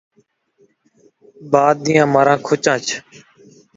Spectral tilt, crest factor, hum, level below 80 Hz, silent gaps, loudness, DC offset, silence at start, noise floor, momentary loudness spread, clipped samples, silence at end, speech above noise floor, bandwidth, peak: -4.5 dB/octave; 18 dB; none; -60 dBFS; none; -16 LUFS; under 0.1%; 1.4 s; -60 dBFS; 8 LU; under 0.1%; 0.75 s; 44 dB; 7.8 kHz; 0 dBFS